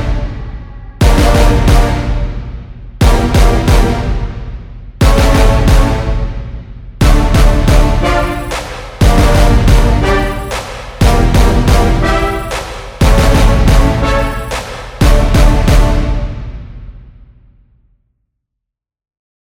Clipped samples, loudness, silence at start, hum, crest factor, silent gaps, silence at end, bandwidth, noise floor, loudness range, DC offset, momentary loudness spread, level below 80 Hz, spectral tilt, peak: under 0.1%; -12 LUFS; 0 s; none; 10 dB; none; 2.5 s; 16 kHz; -78 dBFS; 3 LU; under 0.1%; 16 LU; -12 dBFS; -6 dB/octave; 0 dBFS